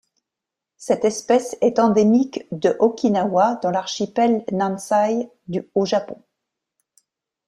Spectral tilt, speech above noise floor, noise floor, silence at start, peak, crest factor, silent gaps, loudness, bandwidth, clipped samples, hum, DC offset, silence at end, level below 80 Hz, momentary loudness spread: -5.5 dB/octave; 66 dB; -86 dBFS; 0.8 s; -4 dBFS; 18 dB; none; -20 LUFS; 12.5 kHz; under 0.1%; none; under 0.1%; 1.3 s; -64 dBFS; 10 LU